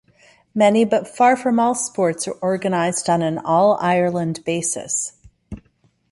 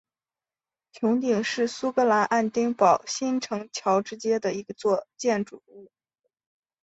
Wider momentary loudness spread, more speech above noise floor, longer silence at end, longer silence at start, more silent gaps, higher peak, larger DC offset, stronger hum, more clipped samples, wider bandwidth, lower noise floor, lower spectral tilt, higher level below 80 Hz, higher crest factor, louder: first, 13 LU vs 8 LU; second, 43 dB vs over 65 dB; second, 0.55 s vs 1 s; second, 0.55 s vs 0.95 s; neither; about the same, -4 dBFS vs -6 dBFS; neither; neither; neither; first, 11.5 kHz vs 8.2 kHz; second, -61 dBFS vs under -90 dBFS; about the same, -4.5 dB/octave vs -4.5 dB/octave; first, -54 dBFS vs -72 dBFS; about the same, 16 dB vs 20 dB; first, -19 LUFS vs -25 LUFS